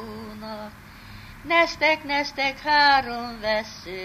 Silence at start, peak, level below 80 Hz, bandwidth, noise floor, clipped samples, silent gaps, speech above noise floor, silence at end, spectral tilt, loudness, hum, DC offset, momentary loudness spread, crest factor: 0 s; -6 dBFS; -50 dBFS; 15 kHz; -43 dBFS; under 0.1%; none; 21 dB; 0 s; -3 dB/octave; -21 LUFS; none; under 0.1%; 23 LU; 18 dB